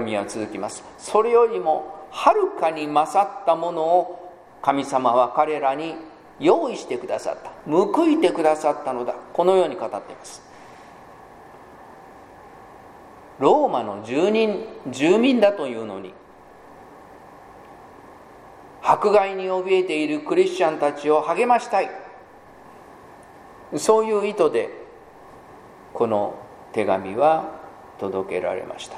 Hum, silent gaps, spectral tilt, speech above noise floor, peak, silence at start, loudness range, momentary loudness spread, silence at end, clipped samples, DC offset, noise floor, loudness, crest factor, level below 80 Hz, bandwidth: none; none; -5 dB/octave; 26 dB; -2 dBFS; 0 s; 5 LU; 15 LU; 0 s; under 0.1%; under 0.1%; -47 dBFS; -21 LUFS; 22 dB; -64 dBFS; 13.5 kHz